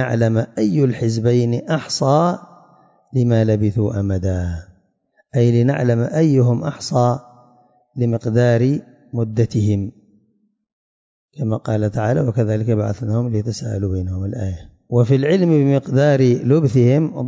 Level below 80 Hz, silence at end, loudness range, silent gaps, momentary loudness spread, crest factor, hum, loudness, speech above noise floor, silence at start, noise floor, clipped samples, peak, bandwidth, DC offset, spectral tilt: -40 dBFS; 0 s; 5 LU; 10.73-11.29 s; 10 LU; 14 dB; none; -18 LUFS; 46 dB; 0 s; -62 dBFS; under 0.1%; -4 dBFS; 7.8 kHz; under 0.1%; -7.5 dB/octave